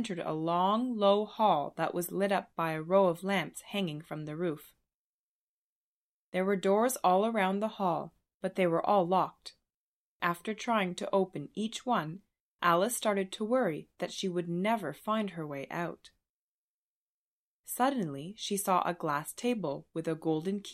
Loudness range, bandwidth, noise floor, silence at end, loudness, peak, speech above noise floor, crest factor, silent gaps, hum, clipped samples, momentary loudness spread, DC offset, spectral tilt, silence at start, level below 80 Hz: 7 LU; 15.5 kHz; under -90 dBFS; 0 s; -32 LUFS; -12 dBFS; over 59 dB; 20 dB; 4.94-6.32 s, 8.34-8.40 s, 9.74-10.20 s, 12.40-12.59 s, 16.29-17.64 s; none; under 0.1%; 11 LU; under 0.1%; -5 dB/octave; 0 s; -76 dBFS